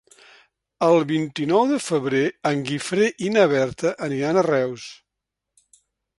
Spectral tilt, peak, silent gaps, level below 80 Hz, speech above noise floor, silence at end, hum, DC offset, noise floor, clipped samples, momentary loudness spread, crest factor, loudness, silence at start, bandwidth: -5.5 dB/octave; -4 dBFS; none; -62 dBFS; 63 dB; 1.25 s; none; under 0.1%; -83 dBFS; under 0.1%; 7 LU; 18 dB; -21 LUFS; 0.8 s; 11.5 kHz